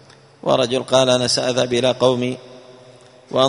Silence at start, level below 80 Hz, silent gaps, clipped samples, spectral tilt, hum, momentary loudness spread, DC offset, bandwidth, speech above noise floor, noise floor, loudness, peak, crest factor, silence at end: 0.45 s; -56 dBFS; none; under 0.1%; -4 dB/octave; none; 10 LU; under 0.1%; 11 kHz; 28 dB; -45 dBFS; -18 LUFS; 0 dBFS; 18 dB; 0 s